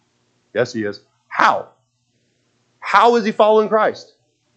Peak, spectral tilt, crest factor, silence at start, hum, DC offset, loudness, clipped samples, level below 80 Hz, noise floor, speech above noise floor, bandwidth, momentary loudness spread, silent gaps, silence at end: 0 dBFS; -4.5 dB/octave; 18 dB; 0.55 s; none; under 0.1%; -17 LUFS; under 0.1%; -74 dBFS; -66 dBFS; 50 dB; 8.6 kHz; 15 LU; none; 0.55 s